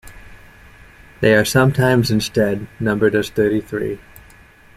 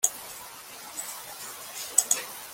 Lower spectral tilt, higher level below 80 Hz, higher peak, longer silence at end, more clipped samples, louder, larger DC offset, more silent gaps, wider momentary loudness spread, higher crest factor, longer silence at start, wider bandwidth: first, -5.5 dB/octave vs 1.5 dB/octave; first, -44 dBFS vs -72 dBFS; about the same, -2 dBFS vs -2 dBFS; first, 0.8 s vs 0 s; neither; first, -17 LUFS vs -29 LUFS; neither; neither; second, 11 LU vs 17 LU; second, 18 dB vs 30 dB; about the same, 0.05 s vs 0 s; about the same, 15.5 kHz vs 17 kHz